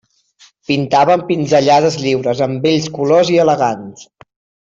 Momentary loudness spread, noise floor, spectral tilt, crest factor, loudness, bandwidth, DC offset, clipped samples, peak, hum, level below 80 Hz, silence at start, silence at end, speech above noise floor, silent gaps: 8 LU; -50 dBFS; -5.5 dB/octave; 12 dB; -14 LUFS; 7.8 kHz; under 0.1%; under 0.1%; -2 dBFS; none; -56 dBFS; 0.7 s; 0.6 s; 36 dB; none